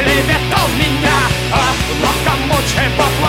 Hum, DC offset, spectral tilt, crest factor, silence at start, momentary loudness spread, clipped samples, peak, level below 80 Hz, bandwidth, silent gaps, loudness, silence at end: none; under 0.1%; -4 dB/octave; 14 dB; 0 s; 2 LU; under 0.1%; 0 dBFS; -24 dBFS; 16.5 kHz; none; -13 LUFS; 0 s